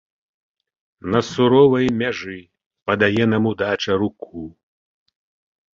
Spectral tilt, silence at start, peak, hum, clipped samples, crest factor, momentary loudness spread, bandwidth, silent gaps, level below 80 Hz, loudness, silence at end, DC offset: -6.5 dB/octave; 1.05 s; -2 dBFS; none; under 0.1%; 18 dB; 20 LU; 7.6 kHz; 2.66-2.70 s; -52 dBFS; -18 LUFS; 1.25 s; under 0.1%